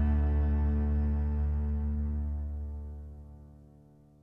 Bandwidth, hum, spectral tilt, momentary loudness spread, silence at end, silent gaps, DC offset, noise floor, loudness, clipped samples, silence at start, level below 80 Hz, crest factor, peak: 2.8 kHz; none; -11.5 dB/octave; 19 LU; 0.6 s; none; under 0.1%; -58 dBFS; -32 LUFS; under 0.1%; 0 s; -32 dBFS; 12 dB; -18 dBFS